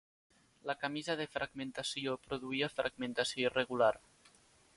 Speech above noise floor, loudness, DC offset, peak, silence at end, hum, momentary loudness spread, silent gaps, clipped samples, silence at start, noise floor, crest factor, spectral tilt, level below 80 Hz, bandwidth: 30 dB; -36 LUFS; under 0.1%; -16 dBFS; 0.8 s; none; 8 LU; none; under 0.1%; 0.65 s; -66 dBFS; 22 dB; -3.5 dB/octave; -70 dBFS; 11.5 kHz